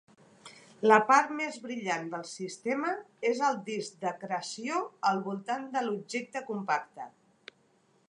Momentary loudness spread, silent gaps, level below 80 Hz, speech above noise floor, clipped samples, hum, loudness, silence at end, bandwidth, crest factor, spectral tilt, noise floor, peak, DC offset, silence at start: 14 LU; none; -86 dBFS; 37 dB; under 0.1%; none; -30 LUFS; 1 s; 11 kHz; 24 dB; -4 dB/octave; -68 dBFS; -6 dBFS; under 0.1%; 0.45 s